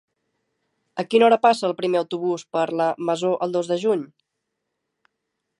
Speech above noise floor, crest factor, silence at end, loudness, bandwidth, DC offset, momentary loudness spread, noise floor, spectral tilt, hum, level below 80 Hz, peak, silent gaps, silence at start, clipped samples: 59 dB; 20 dB; 1.55 s; -21 LUFS; 11 kHz; under 0.1%; 10 LU; -79 dBFS; -5.5 dB/octave; none; -78 dBFS; -2 dBFS; none; 0.95 s; under 0.1%